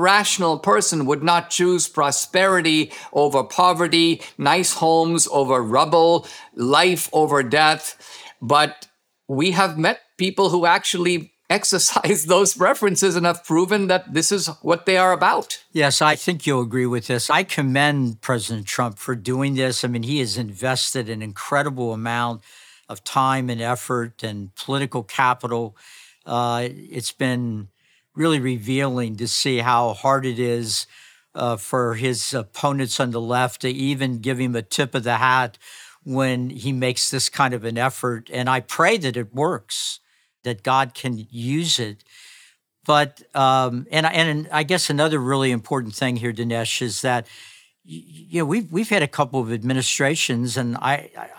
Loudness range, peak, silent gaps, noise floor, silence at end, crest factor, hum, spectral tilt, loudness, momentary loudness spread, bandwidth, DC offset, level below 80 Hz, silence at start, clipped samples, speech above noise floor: 6 LU; -2 dBFS; none; -54 dBFS; 0.05 s; 20 dB; none; -3.5 dB/octave; -20 LUFS; 10 LU; over 20 kHz; under 0.1%; -72 dBFS; 0 s; under 0.1%; 33 dB